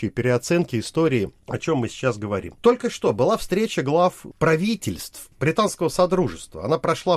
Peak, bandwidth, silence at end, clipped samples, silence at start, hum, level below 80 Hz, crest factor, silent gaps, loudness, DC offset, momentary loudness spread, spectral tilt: -4 dBFS; 15 kHz; 0 s; under 0.1%; 0 s; none; -48 dBFS; 18 dB; none; -22 LUFS; under 0.1%; 8 LU; -5.5 dB/octave